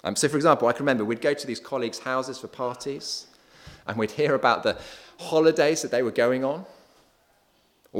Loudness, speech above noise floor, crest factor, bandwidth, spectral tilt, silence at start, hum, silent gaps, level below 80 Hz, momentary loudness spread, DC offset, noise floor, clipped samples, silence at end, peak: -25 LUFS; 40 dB; 22 dB; 16.5 kHz; -4 dB/octave; 0.05 s; none; none; -64 dBFS; 14 LU; under 0.1%; -64 dBFS; under 0.1%; 0 s; -4 dBFS